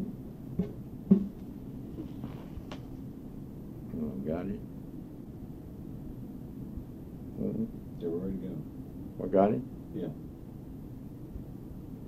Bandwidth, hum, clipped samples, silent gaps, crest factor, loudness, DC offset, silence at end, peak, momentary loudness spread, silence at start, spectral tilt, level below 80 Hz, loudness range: 15 kHz; none; under 0.1%; none; 26 dB; -37 LUFS; under 0.1%; 0 s; -10 dBFS; 17 LU; 0 s; -10 dB/octave; -50 dBFS; 7 LU